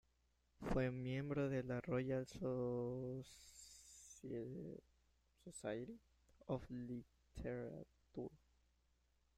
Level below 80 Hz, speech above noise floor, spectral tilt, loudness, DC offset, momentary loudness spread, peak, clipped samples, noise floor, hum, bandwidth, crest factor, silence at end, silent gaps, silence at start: -64 dBFS; 35 dB; -7 dB/octave; -47 LUFS; under 0.1%; 17 LU; -28 dBFS; under 0.1%; -81 dBFS; none; 13.5 kHz; 18 dB; 1 s; none; 0.6 s